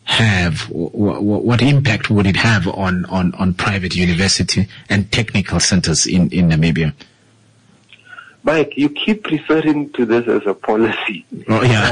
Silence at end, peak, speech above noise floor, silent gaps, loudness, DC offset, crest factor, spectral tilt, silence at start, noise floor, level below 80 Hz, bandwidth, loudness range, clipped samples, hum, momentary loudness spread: 0 s; -4 dBFS; 36 dB; none; -16 LUFS; under 0.1%; 12 dB; -5 dB/octave; 0.05 s; -51 dBFS; -42 dBFS; 11 kHz; 3 LU; under 0.1%; none; 6 LU